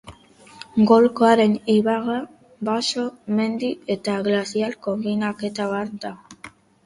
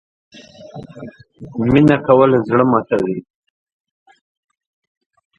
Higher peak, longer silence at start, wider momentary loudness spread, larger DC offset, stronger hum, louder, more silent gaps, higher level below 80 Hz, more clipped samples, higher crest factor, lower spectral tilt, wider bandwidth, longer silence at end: about the same, -2 dBFS vs 0 dBFS; second, 0.05 s vs 0.6 s; second, 18 LU vs 24 LU; neither; neither; second, -21 LUFS vs -14 LUFS; neither; second, -62 dBFS vs -48 dBFS; neither; about the same, 20 dB vs 18 dB; second, -5.5 dB/octave vs -9 dB/octave; first, 11.5 kHz vs 8 kHz; second, 0.35 s vs 2.15 s